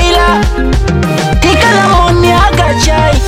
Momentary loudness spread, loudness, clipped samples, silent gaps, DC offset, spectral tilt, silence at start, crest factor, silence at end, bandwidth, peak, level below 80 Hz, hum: 5 LU; -8 LUFS; under 0.1%; none; under 0.1%; -5 dB/octave; 0 s; 8 dB; 0 s; 16 kHz; 0 dBFS; -14 dBFS; none